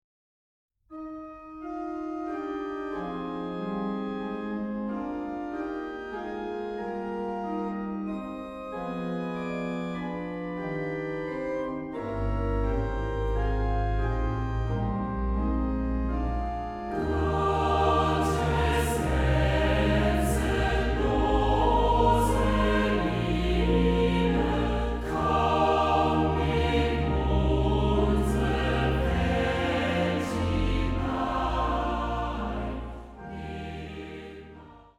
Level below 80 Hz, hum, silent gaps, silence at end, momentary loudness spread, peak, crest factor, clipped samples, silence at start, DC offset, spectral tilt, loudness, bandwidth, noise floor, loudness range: -32 dBFS; none; none; 0.2 s; 12 LU; -12 dBFS; 16 dB; under 0.1%; 0.9 s; under 0.1%; -6.5 dB/octave; -28 LUFS; 14.5 kHz; -49 dBFS; 9 LU